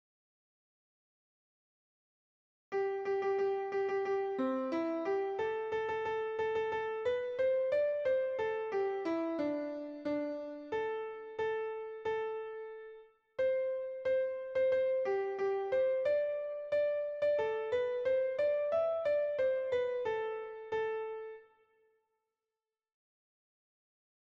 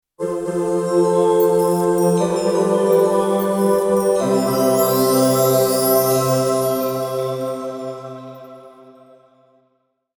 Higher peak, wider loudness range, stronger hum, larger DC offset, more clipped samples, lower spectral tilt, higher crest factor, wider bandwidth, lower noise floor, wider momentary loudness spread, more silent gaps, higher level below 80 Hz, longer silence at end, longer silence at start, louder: second, -22 dBFS vs -4 dBFS; about the same, 6 LU vs 8 LU; neither; neither; neither; about the same, -6 dB/octave vs -5.5 dB/octave; about the same, 12 dB vs 14 dB; second, 7 kHz vs 19 kHz; first, under -90 dBFS vs -67 dBFS; second, 8 LU vs 11 LU; neither; second, -74 dBFS vs -56 dBFS; first, 2.95 s vs 1.5 s; first, 2.7 s vs 0.2 s; second, -35 LUFS vs -17 LUFS